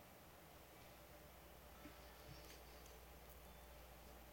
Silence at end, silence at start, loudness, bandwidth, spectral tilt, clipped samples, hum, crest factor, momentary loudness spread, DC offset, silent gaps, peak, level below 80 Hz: 0 s; 0 s; -61 LUFS; 16.5 kHz; -4 dB/octave; under 0.1%; none; 16 dB; 3 LU; under 0.1%; none; -44 dBFS; -66 dBFS